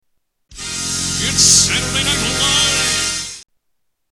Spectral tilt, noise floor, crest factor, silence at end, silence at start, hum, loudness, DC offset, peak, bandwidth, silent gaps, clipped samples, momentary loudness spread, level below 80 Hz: -1 dB/octave; -71 dBFS; 18 dB; 0.7 s; 0.5 s; none; -13 LUFS; under 0.1%; 0 dBFS; 17 kHz; none; under 0.1%; 15 LU; -38 dBFS